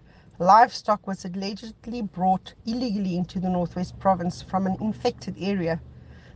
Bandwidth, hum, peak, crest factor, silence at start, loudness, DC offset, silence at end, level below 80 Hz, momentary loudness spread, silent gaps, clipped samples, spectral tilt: 8.6 kHz; none; -4 dBFS; 22 dB; 0.4 s; -25 LUFS; under 0.1%; 0.05 s; -52 dBFS; 15 LU; none; under 0.1%; -6.5 dB/octave